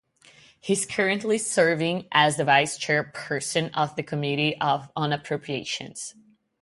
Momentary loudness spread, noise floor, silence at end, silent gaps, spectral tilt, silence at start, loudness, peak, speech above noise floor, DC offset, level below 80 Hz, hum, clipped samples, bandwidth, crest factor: 10 LU; -55 dBFS; 0.5 s; none; -3.5 dB/octave; 0.65 s; -24 LUFS; -4 dBFS; 30 dB; under 0.1%; -66 dBFS; none; under 0.1%; 11.5 kHz; 22 dB